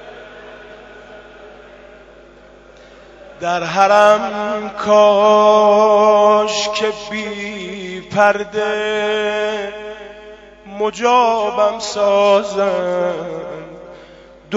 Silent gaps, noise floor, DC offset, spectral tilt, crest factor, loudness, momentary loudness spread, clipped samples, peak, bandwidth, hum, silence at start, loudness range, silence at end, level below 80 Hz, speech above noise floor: none; -43 dBFS; under 0.1%; -3.5 dB/octave; 16 dB; -15 LUFS; 21 LU; under 0.1%; 0 dBFS; 8 kHz; none; 0 s; 7 LU; 0 s; -52 dBFS; 28 dB